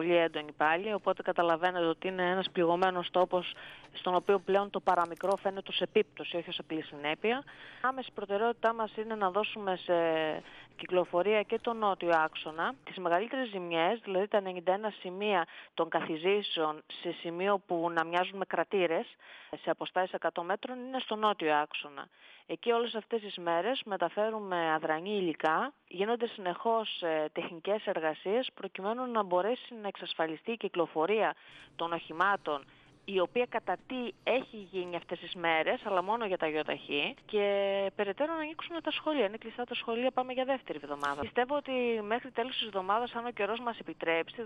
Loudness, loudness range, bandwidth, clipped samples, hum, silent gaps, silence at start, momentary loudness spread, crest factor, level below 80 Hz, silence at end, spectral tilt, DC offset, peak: -32 LUFS; 3 LU; 11 kHz; under 0.1%; none; none; 0 s; 9 LU; 18 dB; -74 dBFS; 0 s; -6 dB/octave; under 0.1%; -14 dBFS